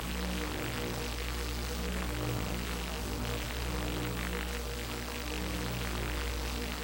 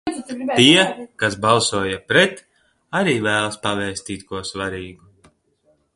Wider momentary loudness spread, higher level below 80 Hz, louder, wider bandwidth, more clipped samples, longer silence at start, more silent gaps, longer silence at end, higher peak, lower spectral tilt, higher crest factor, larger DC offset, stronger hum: second, 2 LU vs 16 LU; first, -40 dBFS vs -52 dBFS; second, -36 LUFS vs -18 LUFS; first, 19.5 kHz vs 11.5 kHz; neither; about the same, 0 s vs 0.05 s; neither; second, 0 s vs 1 s; second, -18 dBFS vs 0 dBFS; about the same, -4 dB/octave vs -3.5 dB/octave; about the same, 16 dB vs 20 dB; neither; first, 60 Hz at -45 dBFS vs none